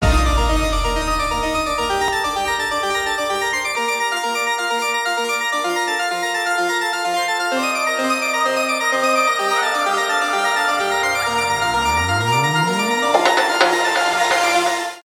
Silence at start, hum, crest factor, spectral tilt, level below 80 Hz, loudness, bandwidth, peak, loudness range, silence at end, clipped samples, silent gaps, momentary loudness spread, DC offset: 0 s; none; 18 dB; -3 dB/octave; -30 dBFS; -18 LUFS; 19 kHz; 0 dBFS; 3 LU; 0.05 s; under 0.1%; none; 4 LU; under 0.1%